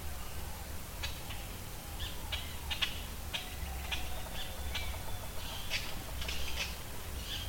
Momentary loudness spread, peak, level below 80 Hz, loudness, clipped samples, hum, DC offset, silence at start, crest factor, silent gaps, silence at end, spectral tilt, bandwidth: 7 LU; -18 dBFS; -44 dBFS; -40 LUFS; under 0.1%; none; under 0.1%; 0 s; 20 dB; none; 0 s; -2.5 dB/octave; 17 kHz